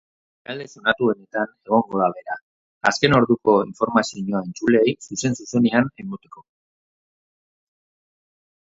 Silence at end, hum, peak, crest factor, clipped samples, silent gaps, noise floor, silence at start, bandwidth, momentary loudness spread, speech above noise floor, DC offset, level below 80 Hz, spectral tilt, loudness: 2.25 s; none; 0 dBFS; 22 dB; under 0.1%; 2.42-2.81 s; under -90 dBFS; 0.5 s; 8 kHz; 16 LU; over 69 dB; under 0.1%; -56 dBFS; -5 dB/octave; -20 LUFS